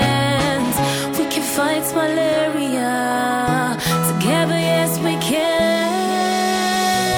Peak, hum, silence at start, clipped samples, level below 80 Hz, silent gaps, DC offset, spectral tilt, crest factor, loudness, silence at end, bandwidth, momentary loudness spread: -4 dBFS; none; 0 s; under 0.1%; -46 dBFS; none; under 0.1%; -4 dB/octave; 14 dB; -18 LUFS; 0 s; 19.5 kHz; 3 LU